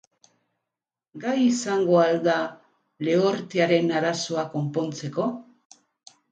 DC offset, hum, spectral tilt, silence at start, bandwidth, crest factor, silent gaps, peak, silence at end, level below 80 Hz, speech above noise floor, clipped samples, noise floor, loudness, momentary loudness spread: under 0.1%; none; -5.5 dB/octave; 1.15 s; 9.4 kHz; 18 dB; none; -6 dBFS; 0.9 s; -74 dBFS; 65 dB; under 0.1%; -88 dBFS; -24 LUFS; 10 LU